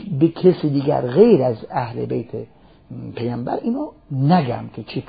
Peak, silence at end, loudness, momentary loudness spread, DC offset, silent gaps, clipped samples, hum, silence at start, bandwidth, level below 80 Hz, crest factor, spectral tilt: 0 dBFS; 0.05 s; -19 LUFS; 17 LU; 0.1%; none; under 0.1%; none; 0 s; 5 kHz; -52 dBFS; 18 dB; -13 dB/octave